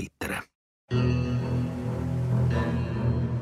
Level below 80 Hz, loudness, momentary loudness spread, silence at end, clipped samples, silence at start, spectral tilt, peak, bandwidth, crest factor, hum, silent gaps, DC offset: -42 dBFS; -28 LUFS; 7 LU; 0 s; under 0.1%; 0 s; -7.5 dB/octave; -14 dBFS; 13 kHz; 14 dB; none; 0.55-0.88 s; under 0.1%